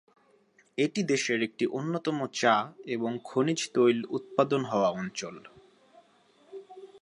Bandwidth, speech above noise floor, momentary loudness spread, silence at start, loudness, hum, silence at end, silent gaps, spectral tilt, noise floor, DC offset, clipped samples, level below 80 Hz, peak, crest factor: 11.5 kHz; 36 dB; 19 LU; 0.75 s; -29 LUFS; none; 0.05 s; none; -4.5 dB/octave; -64 dBFS; under 0.1%; under 0.1%; -76 dBFS; -8 dBFS; 22 dB